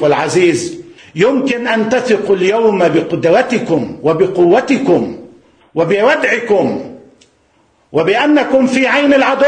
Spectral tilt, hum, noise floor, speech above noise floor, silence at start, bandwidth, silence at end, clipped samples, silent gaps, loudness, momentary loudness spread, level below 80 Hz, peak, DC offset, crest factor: -5.5 dB/octave; none; -54 dBFS; 43 dB; 0 s; 10 kHz; 0 s; under 0.1%; none; -12 LUFS; 9 LU; -54 dBFS; 0 dBFS; under 0.1%; 12 dB